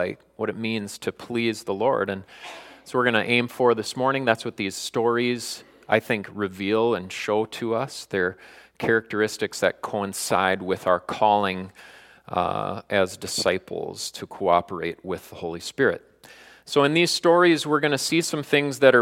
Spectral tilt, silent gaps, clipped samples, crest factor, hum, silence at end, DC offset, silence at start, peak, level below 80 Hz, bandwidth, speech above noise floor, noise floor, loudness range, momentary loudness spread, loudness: -4 dB/octave; none; under 0.1%; 24 dB; none; 0 s; under 0.1%; 0 s; 0 dBFS; -64 dBFS; 16.5 kHz; 26 dB; -49 dBFS; 4 LU; 13 LU; -24 LUFS